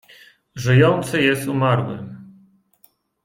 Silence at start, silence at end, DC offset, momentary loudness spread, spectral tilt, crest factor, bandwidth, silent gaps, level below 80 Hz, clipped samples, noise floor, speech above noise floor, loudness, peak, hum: 0.55 s; 0.95 s; under 0.1%; 19 LU; -6.5 dB/octave; 18 dB; 16 kHz; none; -54 dBFS; under 0.1%; -58 dBFS; 41 dB; -18 LUFS; -2 dBFS; none